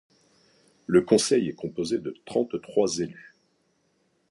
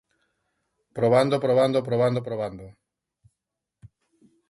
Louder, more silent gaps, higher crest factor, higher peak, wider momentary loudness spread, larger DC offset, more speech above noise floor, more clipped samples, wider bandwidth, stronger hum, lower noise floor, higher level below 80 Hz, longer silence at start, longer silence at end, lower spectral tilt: second, -26 LUFS vs -23 LUFS; neither; about the same, 22 dB vs 18 dB; about the same, -6 dBFS vs -8 dBFS; second, 11 LU vs 14 LU; neither; second, 45 dB vs 62 dB; neither; about the same, 11.5 kHz vs 11.5 kHz; neither; second, -70 dBFS vs -84 dBFS; about the same, -64 dBFS vs -62 dBFS; about the same, 0.9 s vs 0.95 s; first, 1.1 s vs 0.65 s; second, -4.5 dB/octave vs -7 dB/octave